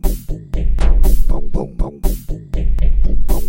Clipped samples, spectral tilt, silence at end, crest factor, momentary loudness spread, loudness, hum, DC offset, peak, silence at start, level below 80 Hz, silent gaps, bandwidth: under 0.1%; -7 dB/octave; 0 s; 12 dB; 10 LU; -21 LUFS; none; under 0.1%; 0 dBFS; 0.05 s; -14 dBFS; none; 16.5 kHz